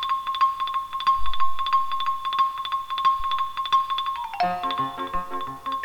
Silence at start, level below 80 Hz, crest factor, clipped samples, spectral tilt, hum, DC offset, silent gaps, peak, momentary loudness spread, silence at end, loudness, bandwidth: 0 s; -46 dBFS; 14 dB; under 0.1%; -3.5 dB/octave; none; under 0.1%; none; -10 dBFS; 7 LU; 0 s; -25 LUFS; 18.5 kHz